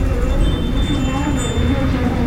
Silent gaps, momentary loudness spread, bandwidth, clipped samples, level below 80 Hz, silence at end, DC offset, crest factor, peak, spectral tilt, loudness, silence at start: none; 2 LU; 15.5 kHz; under 0.1%; -20 dBFS; 0 s; under 0.1%; 12 dB; -4 dBFS; -6 dB/octave; -19 LUFS; 0 s